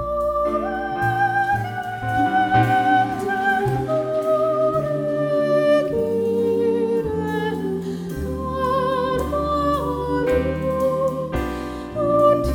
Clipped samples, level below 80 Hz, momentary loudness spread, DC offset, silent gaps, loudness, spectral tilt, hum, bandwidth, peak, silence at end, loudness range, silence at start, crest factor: under 0.1%; -38 dBFS; 8 LU; under 0.1%; none; -21 LUFS; -7 dB/octave; none; 17.5 kHz; -6 dBFS; 0 s; 3 LU; 0 s; 14 dB